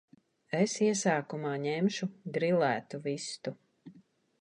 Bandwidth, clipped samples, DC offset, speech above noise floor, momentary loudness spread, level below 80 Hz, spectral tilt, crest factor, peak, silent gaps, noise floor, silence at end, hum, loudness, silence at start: 10.5 kHz; under 0.1%; under 0.1%; 31 dB; 10 LU; -80 dBFS; -5 dB/octave; 18 dB; -14 dBFS; none; -62 dBFS; 0.4 s; none; -32 LUFS; 0.5 s